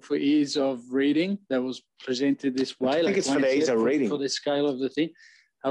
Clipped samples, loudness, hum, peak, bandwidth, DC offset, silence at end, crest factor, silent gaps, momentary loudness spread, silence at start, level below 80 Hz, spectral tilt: under 0.1%; -26 LUFS; none; -14 dBFS; 10.5 kHz; under 0.1%; 0 s; 12 dB; none; 7 LU; 0.05 s; -72 dBFS; -4.5 dB/octave